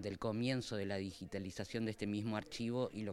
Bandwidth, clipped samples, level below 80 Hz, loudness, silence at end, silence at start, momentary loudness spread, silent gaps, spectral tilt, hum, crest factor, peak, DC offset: 13.5 kHz; under 0.1%; -66 dBFS; -41 LUFS; 0 s; 0 s; 6 LU; none; -6 dB/octave; none; 18 dB; -24 dBFS; under 0.1%